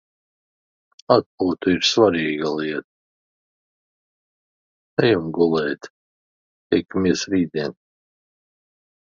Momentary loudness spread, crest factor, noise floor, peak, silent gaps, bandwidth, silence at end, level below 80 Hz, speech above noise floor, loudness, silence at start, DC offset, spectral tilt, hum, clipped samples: 10 LU; 22 dB; under -90 dBFS; 0 dBFS; 1.26-1.38 s, 2.84-4.97 s, 5.90-6.70 s; 7.6 kHz; 1.3 s; -56 dBFS; over 70 dB; -20 LUFS; 1.1 s; under 0.1%; -5 dB/octave; none; under 0.1%